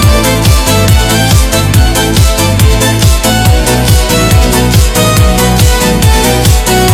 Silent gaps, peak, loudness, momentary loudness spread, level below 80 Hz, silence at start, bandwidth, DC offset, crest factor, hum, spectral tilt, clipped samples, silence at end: none; 0 dBFS; -7 LUFS; 1 LU; -12 dBFS; 0 s; 18.5 kHz; under 0.1%; 6 dB; none; -4.5 dB/octave; 0.7%; 0 s